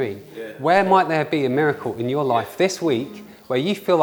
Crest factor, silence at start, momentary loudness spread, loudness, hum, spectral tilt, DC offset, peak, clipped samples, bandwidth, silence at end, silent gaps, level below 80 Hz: 18 dB; 0 s; 14 LU; -20 LUFS; none; -5.5 dB/octave; under 0.1%; -2 dBFS; under 0.1%; over 20 kHz; 0 s; none; -64 dBFS